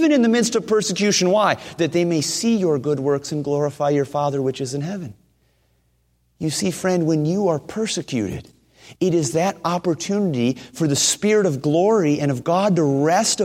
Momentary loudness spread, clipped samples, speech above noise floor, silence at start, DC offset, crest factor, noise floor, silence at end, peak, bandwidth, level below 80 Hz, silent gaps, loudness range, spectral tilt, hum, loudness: 7 LU; under 0.1%; 44 dB; 0 s; under 0.1%; 18 dB; -64 dBFS; 0 s; -2 dBFS; 16 kHz; -58 dBFS; none; 6 LU; -4.5 dB/octave; none; -20 LUFS